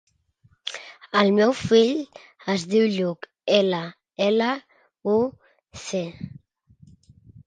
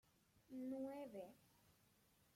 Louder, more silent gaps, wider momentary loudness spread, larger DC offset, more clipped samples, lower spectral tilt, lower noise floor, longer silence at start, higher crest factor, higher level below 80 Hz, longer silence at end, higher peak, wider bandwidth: first, -23 LUFS vs -53 LUFS; neither; first, 17 LU vs 9 LU; neither; neither; second, -5 dB/octave vs -6.5 dB/octave; second, -62 dBFS vs -77 dBFS; first, 0.65 s vs 0.35 s; first, 22 dB vs 16 dB; first, -60 dBFS vs -88 dBFS; first, 1.2 s vs 0.65 s; first, -2 dBFS vs -40 dBFS; second, 9.4 kHz vs 16.5 kHz